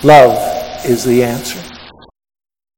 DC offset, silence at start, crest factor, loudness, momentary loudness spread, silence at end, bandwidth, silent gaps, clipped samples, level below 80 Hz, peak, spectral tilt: under 0.1%; 0 s; 12 dB; -12 LUFS; 19 LU; 0.9 s; 18 kHz; none; 1%; -42 dBFS; 0 dBFS; -5 dB/octave